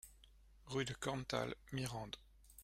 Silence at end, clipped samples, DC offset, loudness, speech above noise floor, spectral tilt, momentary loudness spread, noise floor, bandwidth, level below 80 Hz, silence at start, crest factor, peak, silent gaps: 0 s; under 0.1%; under 0.1%; -44 LUFS; 22 dB; -4.5 dB/octave; 13 LU; -65 dBFS; 16 kHz; -64 dBFS; 0.05 s; 24 dB; -22 dBFS; none